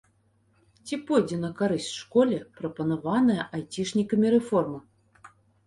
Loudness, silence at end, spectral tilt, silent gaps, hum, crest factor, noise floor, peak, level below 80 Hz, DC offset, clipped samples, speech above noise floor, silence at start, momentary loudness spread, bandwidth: -26 LUFS; 0.4 s; -6 dB/octave; none; none; 18 dB; -66 dBFS; -8 dBFS; -64 dBFS; under 0.1%; under 0.1%; 41 dB; 0.85 s; 12 LU; 11.5 kHz